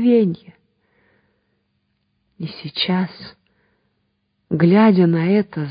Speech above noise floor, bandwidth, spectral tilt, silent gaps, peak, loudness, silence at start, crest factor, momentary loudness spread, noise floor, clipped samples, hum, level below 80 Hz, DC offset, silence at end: 53 dB; 5.2 kHz; -12 dB/octave; none; -2 dBFS; -17 LUFS; 0 s; 18 dB; 20 LU; -69 dBFS; under 0.1%; none; -62 dBFS; under 0.1%; 0 s